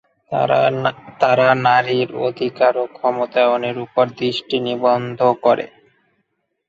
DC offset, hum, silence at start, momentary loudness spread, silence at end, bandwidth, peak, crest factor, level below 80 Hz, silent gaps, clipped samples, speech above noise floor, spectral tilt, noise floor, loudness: under 0.1%; none; 0.3 s; 7 LU; 1.05 s; 7.6 kHz; 0 dBFS; 18 dB; -62 dBFS; none; under 0.1%; 53 dB; -6.5 dB/octave; -70 dBFS; -18 LUFS